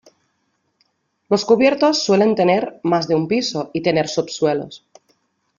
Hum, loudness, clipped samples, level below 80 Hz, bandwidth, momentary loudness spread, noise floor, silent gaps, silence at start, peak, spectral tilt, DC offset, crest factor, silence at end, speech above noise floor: none; -18 LUFS; under 0.1%; -60 dBFS; 7.4 kHz; 7 LU; -69 dBFS; none; 1.3 s; -2 dBFS; -5 dB/octave; under 0.1%; 18 dB; 0.8 s; 51 dB